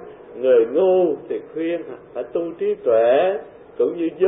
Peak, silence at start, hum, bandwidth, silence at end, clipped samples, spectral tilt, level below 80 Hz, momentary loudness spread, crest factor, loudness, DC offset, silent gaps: -6 dBFS; 0 s; none; 3.9 kHz; 0 s; under 0.1%; -10.5 dB/octave; -64 dBFS; 14 LU; 12 dB; -20 LUFS; under 0.1%; none